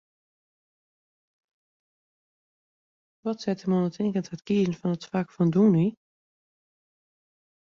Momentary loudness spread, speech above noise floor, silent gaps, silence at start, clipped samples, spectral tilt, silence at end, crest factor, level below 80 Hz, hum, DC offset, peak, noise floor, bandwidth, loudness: 10 LU; over 65 dB; none; 3.25 s; under 0.1%; -8 dB/octave; 1.85 s; 18 dB; -68 dBFS; none; under 0.1%; -12 dBFS; under -90 dBFS; 7.2 kHz; -26 LUFS